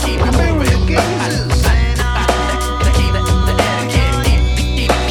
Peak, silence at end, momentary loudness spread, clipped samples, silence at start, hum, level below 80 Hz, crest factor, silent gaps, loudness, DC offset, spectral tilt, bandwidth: 0 dBFS; 0 s; 2 LU; under 0.1%; 0 s; none; -16 dBFS; 12 dB; none; -15 LUFS; under 0.1%; -5 dB/octave; 16 kHz